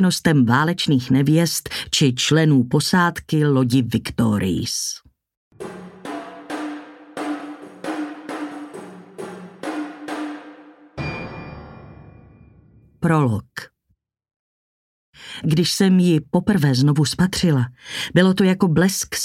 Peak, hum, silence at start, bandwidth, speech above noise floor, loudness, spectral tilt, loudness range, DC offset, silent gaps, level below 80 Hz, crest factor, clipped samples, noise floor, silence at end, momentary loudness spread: -2 dBFS; none; 0 s; 16 kHz; 52 dB; -19 LUFS; -5 dB/octave; 14 LU; under 0.1%; 5.37-5.51 s, 14.36-15.13 s; -50 dBFS; 18 dB; under 0.1%; -69 dBFS; 0 s; 19 LU